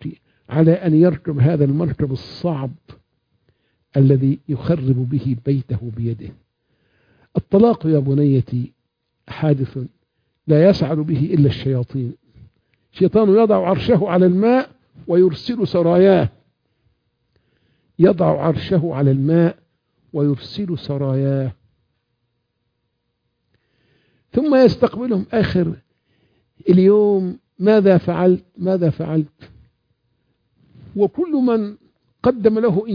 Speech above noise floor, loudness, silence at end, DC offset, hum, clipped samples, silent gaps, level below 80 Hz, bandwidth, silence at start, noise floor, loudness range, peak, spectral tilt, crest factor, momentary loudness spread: 56 dB; -17 LUFS; 0 s; under 0.1%; none; under 0.1%; none; -50 dBFS; 5.2 kHz; 0 s; -72 dBFS; 7 LU; -2 dBFS; -10 dB/octave; 16 dB; 13 LU